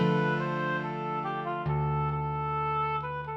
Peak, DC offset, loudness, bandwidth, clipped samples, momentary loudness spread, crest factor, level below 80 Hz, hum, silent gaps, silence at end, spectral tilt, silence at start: -14 dBFS; under 0.1%; -30 LUFS; 6 kHz; under 0.1%; 4 LU; 14 dB; -50 dBFS; none; none; 0 s; -8.5 dB/octave; 0 s